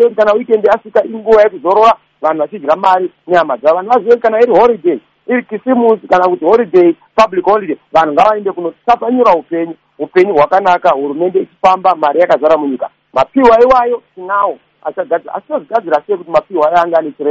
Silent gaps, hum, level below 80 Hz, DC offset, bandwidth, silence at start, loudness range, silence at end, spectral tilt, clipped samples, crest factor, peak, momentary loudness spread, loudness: none; none; -48 dBFS; under 0.1%; 7.6 kHz; 0 s; 2 LU; 0 s; -6 dB/octave; 0.2%; 10 dB; 0 dBFS; 9 LU; -11 LUFS